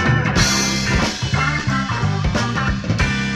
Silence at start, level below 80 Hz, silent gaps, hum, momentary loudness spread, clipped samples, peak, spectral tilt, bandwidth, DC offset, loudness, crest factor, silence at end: 0 s; -28 dBFS; none; none; 5 LU; under 0.1%; -2 dBFS; -4 dB/octave; 14 kHz; under 0.1%; -18 LUFS; 16 dB; 0 s